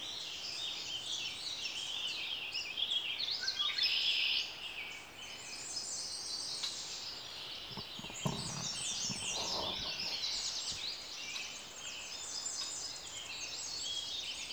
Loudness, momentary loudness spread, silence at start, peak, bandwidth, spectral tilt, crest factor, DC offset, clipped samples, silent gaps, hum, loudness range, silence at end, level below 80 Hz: -37 LUFS; 10 LU; 0 s; -20 dBFS; over 20 kHz; -0.5 dB/octave; 20 dB; under 0.1%; under 0.1%; none; none; 6 LU; 0 s; -68 dBFS